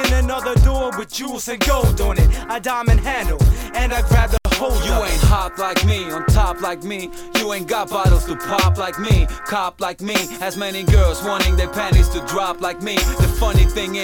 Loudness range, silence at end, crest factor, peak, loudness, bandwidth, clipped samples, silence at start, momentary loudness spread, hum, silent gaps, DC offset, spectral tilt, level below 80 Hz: 2 LU; 0 s; 16 dB; 0 dBFS; -19 LUFS; 18.5 kHz; under 0.1%; 0 s; 7 LU; none; none; under 0.1%; -5 dB/octave; -20 dBFS